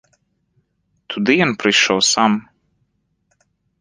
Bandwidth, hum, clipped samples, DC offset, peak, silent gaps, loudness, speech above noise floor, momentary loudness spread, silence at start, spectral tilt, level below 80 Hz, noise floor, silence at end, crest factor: 10.5 kHz; none; under 0.1%; under 0.1%; -2 dBFS; none; -15 LUFS; 51 dB; 9 LU; 1.1 s; -3 dB/octave; -60 dBFS; -67 dBFS; 1.4 s; 18 dB